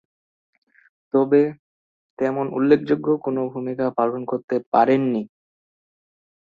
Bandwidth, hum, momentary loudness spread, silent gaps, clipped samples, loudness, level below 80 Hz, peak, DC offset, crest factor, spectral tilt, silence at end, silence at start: 6.6 kHz; none; 8 LU; 1.59-2.17 s, 4.44-4.48 s, 4.66-4.72 s; under 0.1%; -21 LUFS; -66 dBFS; -2 dBFS; under 0.1%; 20 dB; -9 dB/octave; 1.3 s; 1.15 s